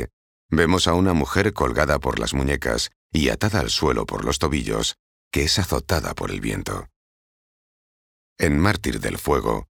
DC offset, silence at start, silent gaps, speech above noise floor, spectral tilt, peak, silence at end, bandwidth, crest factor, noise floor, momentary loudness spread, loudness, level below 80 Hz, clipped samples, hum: under 0.1%; 0 s; 0.13-0.49 s, 2.96-3.10 s, 4.99-5.31 s, 6.96-8.36 s; over 69 dB; -4.5 dB/octave; -2 dBFS; 0.1 s; over 20 kHz; 22 dB; under -90 dBFS; 8 LU; -22 LUFS; -36 dBFS; under 0.1%; none